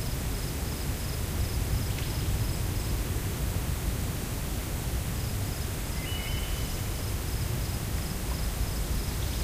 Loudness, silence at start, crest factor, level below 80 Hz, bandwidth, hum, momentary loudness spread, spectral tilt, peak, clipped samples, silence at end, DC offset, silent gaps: -32 LUFS; 0 s; 14 dB; -34 dBFS; 16 kHz; none; 2 LU; -4.5 dB/octave; -18 dBFS; under 0.1%; 0 s; under 0.1%; none